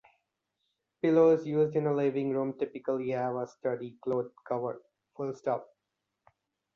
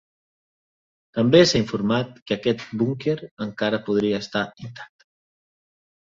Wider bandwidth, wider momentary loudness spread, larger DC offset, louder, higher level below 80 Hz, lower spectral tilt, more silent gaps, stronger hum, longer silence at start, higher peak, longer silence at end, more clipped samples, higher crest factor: second, 7 kHz vs 7.8 kHz; second, 12 LU vs 16 LU; neither; second, -31 LUFS vs -22 LUFS; second, -76 dBFS vs -56 dBFS; first, -8.5 dB/octave vs -5.5 dB/octave; second, none vs 2.22-2.26 s, 3.31-3.37 s; neither; about the same, 1.05 s vs 1.15 s; second, -12 dBFS vs -2 dBFS; about the same, 1.1 s vs 1.2 s; neither; about the same, 18 dB vs 22 dB